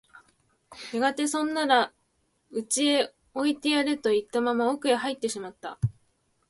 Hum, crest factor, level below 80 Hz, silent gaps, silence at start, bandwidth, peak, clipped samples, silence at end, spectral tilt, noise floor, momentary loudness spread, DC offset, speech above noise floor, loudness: none; 20 dB; -60 dBFS; none; 0.15 s; 11.5 kHz; -8 dBFS; under 0.1%; 0.6 s; -4 dB/octave; -72 dBFS; 12 LU; under 0.1%; 46 dB; -27 LUFS